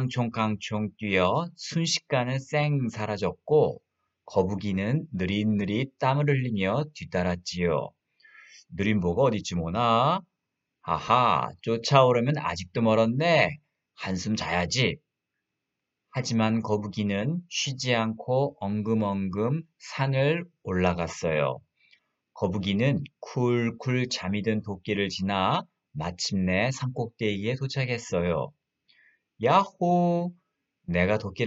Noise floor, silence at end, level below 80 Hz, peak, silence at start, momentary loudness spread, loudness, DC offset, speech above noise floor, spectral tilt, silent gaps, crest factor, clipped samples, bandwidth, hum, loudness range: -84 dBFS; 0 s; -56 dBFS; -2 dBFS; 0 s; 9 LU; -27 LUFS; under 0.1%; 58 dB; -5.5 dB/octave; none; 24 dB; under 0.1%; 8 kHz; none; 4 LU